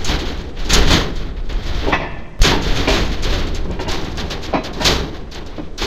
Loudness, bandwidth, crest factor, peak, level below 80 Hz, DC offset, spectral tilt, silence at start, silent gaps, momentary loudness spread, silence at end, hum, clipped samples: -19 LUFS; 15.5 kHz; 16 dB; 0 dBFS; -20 dBFS; under 0.1%; -3.5 dB/octave; 0 s; none; 13 LU; 0 s; none; under 0.1%